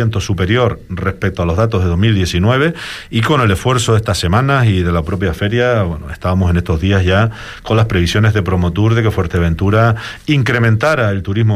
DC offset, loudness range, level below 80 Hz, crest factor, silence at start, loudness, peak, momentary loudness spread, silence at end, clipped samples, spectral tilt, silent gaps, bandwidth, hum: under 0.1%; 1 LU; -30 dBFS; 12 dB; 0 s; -14 LUFS; -2 dBFS; 6 LU; 0 s; under 0.1%; -6.5 dB/octave; none; 13.5 kHz; none